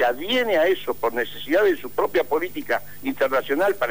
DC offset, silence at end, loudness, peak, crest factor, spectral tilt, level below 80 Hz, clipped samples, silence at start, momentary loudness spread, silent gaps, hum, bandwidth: 2%; 0 s; -22 LUFS; -10 dBFS; 12 dB; -4 dB/octave; -58 dBFS; under 0.1%; 0 s; 6 LU; none; 50 Hz at -55 dBFS; 16 kHz